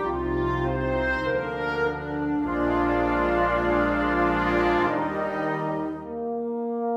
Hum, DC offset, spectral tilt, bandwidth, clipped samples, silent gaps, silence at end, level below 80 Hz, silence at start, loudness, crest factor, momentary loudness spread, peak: none; under 0.1%; -7.5 dB/octave; 8.2 kHz; under 0.1%; none; 0 s; -40 dBFS; 0 s; -25 LUFS; 16 dB; 7 LU; -10 dBFS